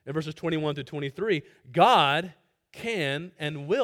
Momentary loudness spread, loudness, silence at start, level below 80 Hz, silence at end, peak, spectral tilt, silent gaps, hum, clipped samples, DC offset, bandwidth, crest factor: 14 LU; -26 LUFS; 0.05 s; -66 dBFS; 0 s; -6 dBFS; -5.5 dB/octave; none; none; under 0.1%; under 0.1%; 16 kHz; 22 dB